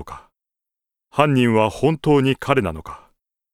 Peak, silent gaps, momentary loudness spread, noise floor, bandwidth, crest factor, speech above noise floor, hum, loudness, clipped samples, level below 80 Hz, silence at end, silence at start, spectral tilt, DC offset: 0 dBFS; none; 18 LU; -86 dBFS; 14.5 kHz; 20 dB; 69 dB; none; -18 LUFS; under 0.1%; -46 dBFS; 0.55 s; 0 s; -7 dB/octave; under 0.1%